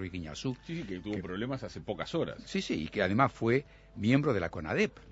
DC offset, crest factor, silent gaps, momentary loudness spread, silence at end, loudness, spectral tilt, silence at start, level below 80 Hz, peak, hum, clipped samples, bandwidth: under 0.1%; 22 dB; none; 11 LU; 0 s; -33 LUFS; -6.5 dB/octave; 0 s; -56 dBFS; -10 dBFS; none; under 0.1%; 8 kHz